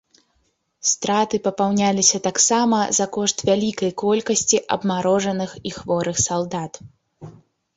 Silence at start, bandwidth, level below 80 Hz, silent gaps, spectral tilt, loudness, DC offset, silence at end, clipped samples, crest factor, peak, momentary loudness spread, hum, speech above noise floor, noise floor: 0.85 s; 8 kHz; -54 dBFS; none; -3 dB/octave; -20 LUFS; under 0.1%; 0.45 s; under 0.1%; 18 dB; -2 dBFS; 8 LU; none; 47 dB; -68 dBFS